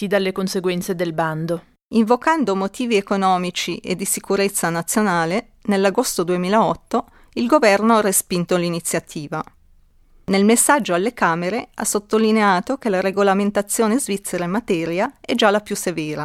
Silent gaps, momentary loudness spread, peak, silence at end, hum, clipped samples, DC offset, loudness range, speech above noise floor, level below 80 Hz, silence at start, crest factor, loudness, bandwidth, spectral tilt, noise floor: 1.85-1.91 s; 9 LU; -2 dBFS; 0 s; none; under 0.1%; under 0.1%; 2 LU; 33 dB; -54 dBFS; 0 s; 18 dB; -19 LUFS; 16 kHz; -4 dB/octave; -52 dBFS